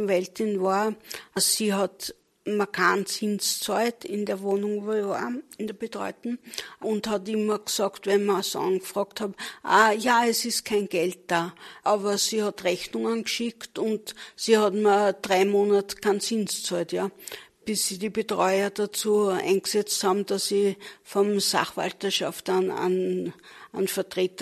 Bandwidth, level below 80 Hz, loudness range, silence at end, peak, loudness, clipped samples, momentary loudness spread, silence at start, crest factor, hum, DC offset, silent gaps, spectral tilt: 13.5 kHz; -70 dBFS; 4 LU; 0 s; -6 dBFS; -25 LUFS; under 0.1%; 12 LU; 0 s; 20 dB; none; under 0.1%; none; -3 dB/octave